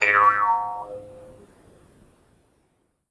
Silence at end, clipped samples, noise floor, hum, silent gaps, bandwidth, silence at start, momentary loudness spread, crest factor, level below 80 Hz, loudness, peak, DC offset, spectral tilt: 1.85 s; under 0.1%; -69 dBFS; none; none; 11 kHz; 0 s; 23 LU; 20 dB; -62 dBFS; -20 LUFS; -4 dBFS; under 0.1%; -3 dB/octave